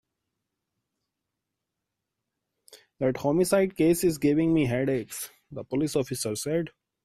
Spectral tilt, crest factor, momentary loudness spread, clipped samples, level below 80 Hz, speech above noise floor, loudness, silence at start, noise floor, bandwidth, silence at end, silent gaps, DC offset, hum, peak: -5.5 dB/octave; 18 dB; 13 LU; under 0.1%; -58 dBFS; 60 dB; -26 LUFS; 2.75 s; -85 dBFS; 15.5 kHz; 0.35 s; none; under 0.1%; none; -12 dBFS